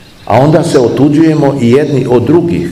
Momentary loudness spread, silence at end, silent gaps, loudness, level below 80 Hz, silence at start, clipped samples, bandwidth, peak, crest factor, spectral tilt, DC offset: 2 LU; 0 s; none; -8 LUFS; -40 dBFS; 0.25 s; 3%; 13 kHz; 0 dBFS; 8 dB; -7.5 dB/octave; 0.5%